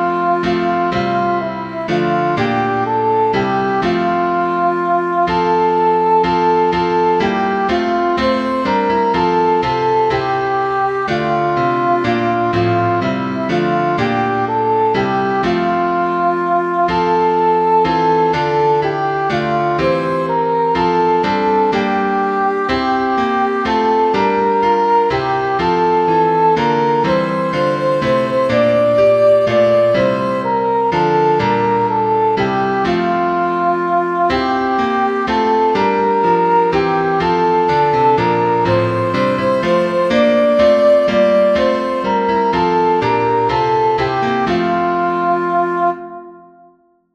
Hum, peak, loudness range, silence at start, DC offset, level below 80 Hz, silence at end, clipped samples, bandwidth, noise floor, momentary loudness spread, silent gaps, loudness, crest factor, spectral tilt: none; -2 dBFS; 3 LU; 0 s; under 0.1%; -44 dBFS; 0.75 s; under 0.1%; 9.4 kHz; -51 dBFS; 4 LU; none; -15 LUFS; 12 dB; -7 dB/octave